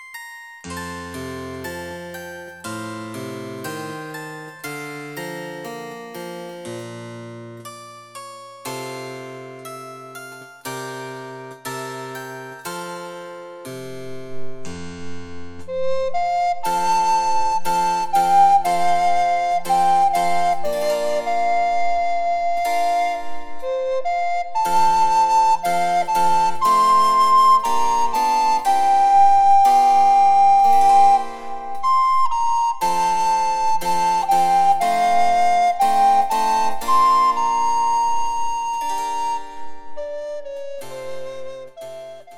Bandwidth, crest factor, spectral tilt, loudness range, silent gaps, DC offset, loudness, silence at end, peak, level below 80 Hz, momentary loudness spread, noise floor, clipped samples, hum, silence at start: 17 kHz; 14 dB; -3.5 dB/octave; 18 LU; none; under 0.1%; -18 LUFS; 0 s; -4 dBFS; -54 dBFS; 21 LU; -38 dBFS; under 0.1%; none; 0 s